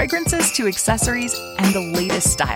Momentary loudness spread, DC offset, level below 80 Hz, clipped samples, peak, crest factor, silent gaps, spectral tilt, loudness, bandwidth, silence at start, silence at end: 4 LU; under 0.1%; -34 dBFS; under 0.1%; -4 dBFS; 16 dB; none; -3 dB/octave; -18 LUFS; 17 kHz; 0 s; 0 s